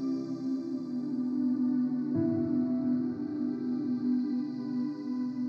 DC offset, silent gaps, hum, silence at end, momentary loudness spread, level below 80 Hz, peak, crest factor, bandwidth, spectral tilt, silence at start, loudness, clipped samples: under 0.1%; none; none; 0 s; 5 LU; -78 dBFS; -18 dBFS; 12 dB; 5.8 kHz; -9 dB/octave; 0 s; -32 LUFS; under 0.1%